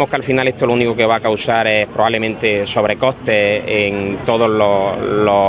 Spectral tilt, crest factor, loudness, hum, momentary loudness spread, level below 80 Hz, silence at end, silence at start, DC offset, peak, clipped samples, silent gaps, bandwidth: -9.5 dB/octave; 14 dB; -15 LUFS; none; 3 LU; -44 dBFS; 0 s; 0 s; under 0.1%; 0 dBFS; under 0.1%; none; 4 kHz